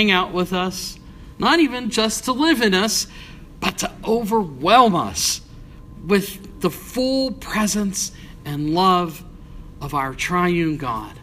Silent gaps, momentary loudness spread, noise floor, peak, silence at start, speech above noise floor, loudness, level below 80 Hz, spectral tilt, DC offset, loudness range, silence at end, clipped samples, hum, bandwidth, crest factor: none; 13 LU; -39 dBFS; 0 dBFS; 0 s; 20 dB; -20 LUFS; -42 dBFS; -3.5 dB/octave; under 0.1%; 4 LU; 0 s; under 0.1%; none; 15.5 kHz; 20 dB